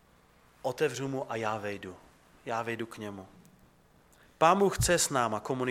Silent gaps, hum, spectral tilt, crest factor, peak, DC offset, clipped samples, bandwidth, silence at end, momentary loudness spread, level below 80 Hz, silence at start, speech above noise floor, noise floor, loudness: none; none; -4 dB/octave; 22 dB; -10 dBFS; under 0.1%; under 0.1%; 16.5 kHz; 0 s; 17 LU; -52 dBFS; 0.65 s; 32 dB; -62 dBFS; -30 LUFS